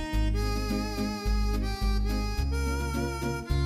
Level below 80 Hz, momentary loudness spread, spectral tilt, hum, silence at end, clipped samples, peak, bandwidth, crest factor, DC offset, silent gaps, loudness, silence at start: -30 dBFS; 2 LU; -5.5 dB/octave; none; 0 s; under 0.1%; -16 dBFS; 15 kHz; 12 dB; under 0.1%; none; -30 LUFS; 0 s